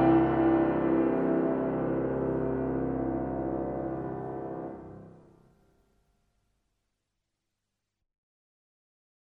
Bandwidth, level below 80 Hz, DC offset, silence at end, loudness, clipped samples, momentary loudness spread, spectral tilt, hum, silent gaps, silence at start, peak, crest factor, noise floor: 3.4 kHz; -52 dBFS; under 0.1%; 4.3 s; -29 LUFS; under 0.1%; 14 LU; -11 dB/octave; none; none; 0 s; -12 dBFS; 18 dB; -84 dBFS